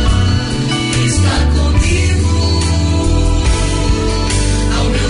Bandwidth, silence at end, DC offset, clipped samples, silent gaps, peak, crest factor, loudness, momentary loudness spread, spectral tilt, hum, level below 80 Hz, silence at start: 11 kHz; 0 s; under 0.1%; under 0.1%; none; -2 dBFS; 10 dB; -14 LUFS; 2 LU; -5 dB/octave; none; -16 dBFS; 0 s